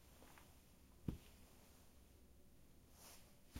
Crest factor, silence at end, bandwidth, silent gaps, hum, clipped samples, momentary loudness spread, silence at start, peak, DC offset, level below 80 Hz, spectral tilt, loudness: 30 dB; 0 s; 16 kHz; none; none; under 0.1%; 16 LU; 0 s; -28 dBFS; under 0.1%; -66 dBFS; -5.5 dB/octave; -60 LUFS